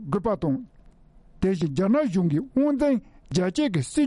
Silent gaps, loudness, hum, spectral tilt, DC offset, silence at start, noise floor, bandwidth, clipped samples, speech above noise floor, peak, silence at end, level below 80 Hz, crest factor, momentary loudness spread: none; -25 LUFS; none; -7 dB/octave; under 0.1%; 0 s; -52 dBFS; 11 kHz; under 0.1%; 29 dB; -10 dBFS; 0 s; -48 dBFS; 14 dB; 6 LU